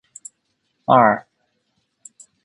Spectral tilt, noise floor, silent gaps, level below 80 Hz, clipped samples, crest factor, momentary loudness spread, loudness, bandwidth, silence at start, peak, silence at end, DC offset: -5.5 dB/octave; -71 dBFS; none; -64 dBFS; under 0.1%; 22 dB; 26 LU; -17 LUFS; 11.5 kHz; 0.9 s; 0 dBFS; 1.25 s; under 0.1%